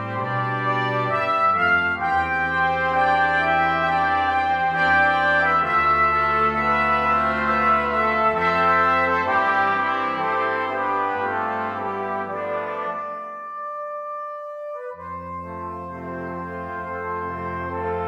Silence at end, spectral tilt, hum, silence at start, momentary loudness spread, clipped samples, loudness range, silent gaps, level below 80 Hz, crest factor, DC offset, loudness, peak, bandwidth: 0 s; -6 dB/octave; none; 0 s; 14 LU; under 0.1%; 13 LU; none; -48 dBFS; 14 dB; under 0.1%; -21 LUFS; -8 dBFS; 9.2 kHz